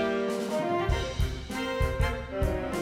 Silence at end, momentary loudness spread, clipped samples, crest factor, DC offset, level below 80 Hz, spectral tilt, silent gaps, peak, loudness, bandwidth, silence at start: 0 s; 4 LU; under 0.1%; 14 dB; under 0.1%; -34 dBFS; -6 dB/octave; none; -14 dBFS; -30 LUFS; 16 kHz; 0 s